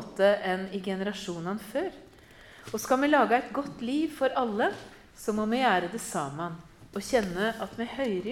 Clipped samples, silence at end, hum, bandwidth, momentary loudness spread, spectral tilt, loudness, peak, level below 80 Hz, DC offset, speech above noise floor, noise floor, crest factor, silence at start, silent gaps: under 0.1%; 0 s; none; 17.5 kHz; 13 LU; -4.5 dB/octave; -29 LUFS; -10 dBFS; -60 dBFS; under 0.1%; 24 dB; -52 dBFS; 20 dB; 0 s; none